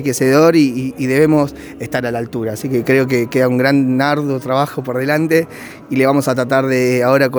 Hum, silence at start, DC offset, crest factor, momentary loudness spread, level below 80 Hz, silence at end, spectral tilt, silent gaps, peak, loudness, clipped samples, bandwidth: none; 0 s; under 0.1%; 14 dB; 10 LU; -52 dBFS; 0 s; -6 dB/octave; none; 0 dBFS; -15 LUFS; under 0.1%; over 20 kHz